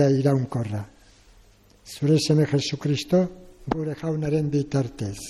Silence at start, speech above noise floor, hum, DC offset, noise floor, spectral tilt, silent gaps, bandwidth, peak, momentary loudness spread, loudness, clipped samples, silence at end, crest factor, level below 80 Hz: 0 s; 32 dB; none; under 0.1%; -54 dBFS; -6.5 dB/octave; none; 12.5 kHz; -8 dBFS; 12 LU; -24 LUFS; under 0.1%; 0 s; 16 dB; -52 dBFS